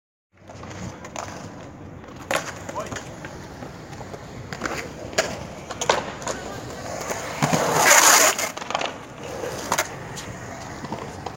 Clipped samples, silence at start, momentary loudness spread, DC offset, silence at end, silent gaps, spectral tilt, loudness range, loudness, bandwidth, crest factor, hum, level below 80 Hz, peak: under 0.1%; 0.4 s; 22 LU; under 0.1%; 0 s; none; -2 dB/octave; 14 LU; -22 LUFS; 17 kHz; 26 dB; none; -50 dBFS; 0 dBFS